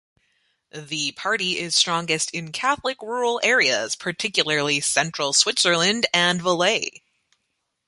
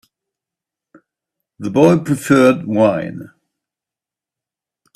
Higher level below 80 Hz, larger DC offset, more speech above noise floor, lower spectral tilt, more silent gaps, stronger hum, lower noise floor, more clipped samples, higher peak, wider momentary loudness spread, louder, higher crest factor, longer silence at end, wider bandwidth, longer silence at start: second, -66 dBFS vs -58 dBFS; neither; second, 53 dB vs 74 dB; second, -1.5 dB/octave vs -7 dB/octave; neither; neither; second, -76 dBFS vs -88 dBFS; neither; about the same, -2 dBFS vs 0 dBFS; second, 8 LU vs 17 LU; second, -20 LUFS vs -14 LUFS; about the same, 22 dB vs 18 dB; second, 1 s vs 1.7 s; second, 11.5 kHz vs 14 kHz; second, 0.75 s vs 1.6 s